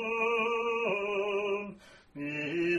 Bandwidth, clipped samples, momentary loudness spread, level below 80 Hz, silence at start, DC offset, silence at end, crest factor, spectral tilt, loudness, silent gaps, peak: 10.5 kHz; under 0.1%; 12 LU; -70 dBFS; 0 s; under 0.1%; 0 s; 14 dB; -5.5 dB/octave; -31 LUFS; none; -18 dBFS